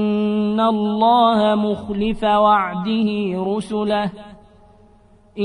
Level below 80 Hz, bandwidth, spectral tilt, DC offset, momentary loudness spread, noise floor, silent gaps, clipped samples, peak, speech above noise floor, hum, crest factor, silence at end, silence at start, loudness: -46 dBFS; 10.5 kHz; -7 dB/octave; under 0.1%; 8 LU; -50 dBFS; none; under 0.1%; -4 dBFS; 33 dB; none; 14 dB; 0 s; 0 s; -18 LUFS